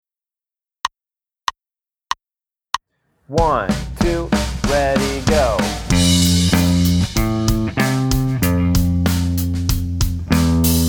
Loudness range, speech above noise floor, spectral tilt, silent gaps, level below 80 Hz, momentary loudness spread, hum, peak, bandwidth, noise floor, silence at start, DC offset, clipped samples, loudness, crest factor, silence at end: 8 LU; over 73 dB; -5 dB/octave; none; -26 dBFS; 13 LU; none; 0 dBFS; over 20 kHz; under -90 dBFS; 0.85 s; under 0.1%; under 0.1%; -18 LUFS; 16 dB; 0 s